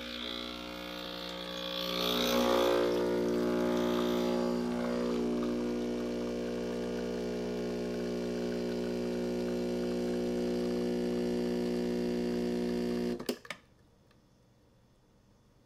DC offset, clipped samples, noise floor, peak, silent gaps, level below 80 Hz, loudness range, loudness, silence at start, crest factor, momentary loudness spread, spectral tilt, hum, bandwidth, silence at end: under 0.1%; under 0.1%; -65 dBFS; -14 dBFS; none; -54 dBFS; 5 LU; -33 LUFS; 0 s; 18 dB; 9 LU; -5 dB/octave; none; 16 kHz; 2.1 s